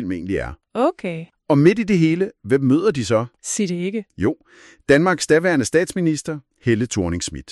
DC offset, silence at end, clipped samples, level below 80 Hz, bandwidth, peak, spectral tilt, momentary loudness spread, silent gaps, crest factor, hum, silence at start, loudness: under 0.1%; 0 s; under 0.1%; -46 dBFS; 12.5 kHz; -2 dBFS; -5.5 dB/octave; 11 LU; none; 16 dB; none; 0 s; -19 LUFS